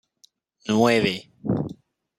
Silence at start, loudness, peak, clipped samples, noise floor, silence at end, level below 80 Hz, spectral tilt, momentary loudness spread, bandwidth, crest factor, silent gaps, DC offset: 0.65 s; -23 LUFS; -6 dBFS; under 0.1%; -61 dBFS; 0.45 s; -58 dBFS; -5.5 dB/octave; 14 LU; 14.5 kHz; 20 dB; none; under 0.1%